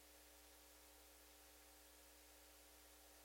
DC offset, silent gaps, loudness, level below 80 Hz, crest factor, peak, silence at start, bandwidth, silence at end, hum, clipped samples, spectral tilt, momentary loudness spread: under 0.1%; none; -64 LUFS; -76 dBFS; 14 dB; -52 dBFS; 0 s; 16.5 kHz; 0 s; none; under 0.1%; -1.5 dB/octave; 0 LU